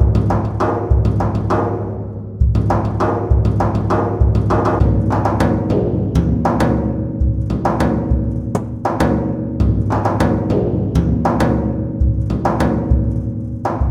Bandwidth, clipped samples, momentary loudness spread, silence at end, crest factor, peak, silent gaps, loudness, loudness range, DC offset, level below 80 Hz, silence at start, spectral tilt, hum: 11 kHz; under 0.1%; 5 LU; 0 s; 14 dB; 0 dBFS; none; -17 LUFS; 2 LU; under 0.1%; -22 dBFS; 0 s; -9 dB/octave; none